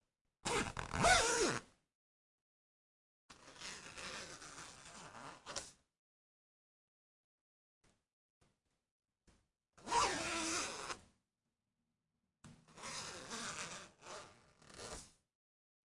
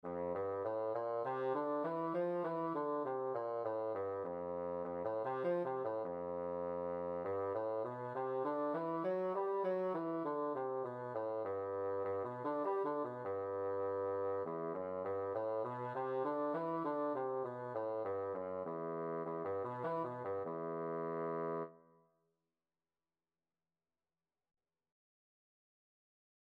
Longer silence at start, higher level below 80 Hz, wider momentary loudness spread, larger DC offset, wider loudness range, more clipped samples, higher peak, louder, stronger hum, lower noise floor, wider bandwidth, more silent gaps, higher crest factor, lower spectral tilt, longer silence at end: first, 0.45 s vs 0.05 s; first, -62 dBFS vs -84 dBFS; first, 20 LU vs 4 LU; neither; first, 16 LU vs 3 LU; neither; first, -18 dBFS vs -26 dBFS; about the same, -39 LUFS vs -40 LUFS; neither; about the same, under -90 dBFS vs under -90 dBFS; first, 11.5 kHz vs 5.2 kHz; first, 1.95-3.29 s, 5.99-7.81 s, 8.13-8.41 s, 8.91-9.00 s vs none; first, 26 dB vs 14 dB; second, -2 dB/octave vs -9.5 dB/octave; second, 0.9 s vs 4.7 s